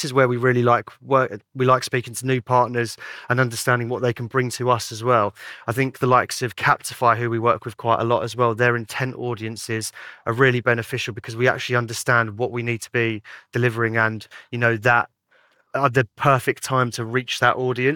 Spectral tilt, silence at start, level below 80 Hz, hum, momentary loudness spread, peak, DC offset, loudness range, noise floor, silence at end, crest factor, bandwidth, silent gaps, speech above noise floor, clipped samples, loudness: -5 dB/octave; 0 s; -66 dBFS; none; 9 LU; -4 dBFS; under 0.1%; 2 LU; -60 dBFS; 0 s; 18 dB; 19 kHz; none; 39 dB; under 0.1%; -21 LUFS